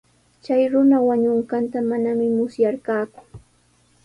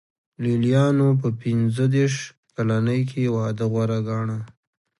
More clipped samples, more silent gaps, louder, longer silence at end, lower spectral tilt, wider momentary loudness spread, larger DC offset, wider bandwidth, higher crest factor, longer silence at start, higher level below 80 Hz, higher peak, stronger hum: neither; second, none vs 2.37-2.43 s; about the same, -20 LUFS vs -22 LUFS; about the same, 0.65 s vs 0.55 s; about the same, -8 dB/octave vs -7.5 dB/octave; about the same, 9 LU vs 11 LU; neither; about the same, 10.5 kHz vs 11.5 kHz; about the same, 14 dB vs 16 dB; about the same, 0.5 s vs 0.4 s; about the same, -60 dBFS vs -60 dBFS; about the same, -8 dBFS vs -6 dBFS; first, 60 Hz at -45 dBFS vs none